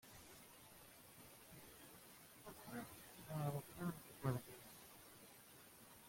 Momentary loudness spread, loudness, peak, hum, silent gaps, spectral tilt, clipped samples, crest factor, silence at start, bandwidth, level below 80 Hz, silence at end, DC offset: 16 LU; -53 LUFS; -28 dBFS; none; none; -5.5 dB/octave; under 0.1%; 26 dB; 0 s; 16.5 kHz; -76 dBFS; 0 s; under 0.1%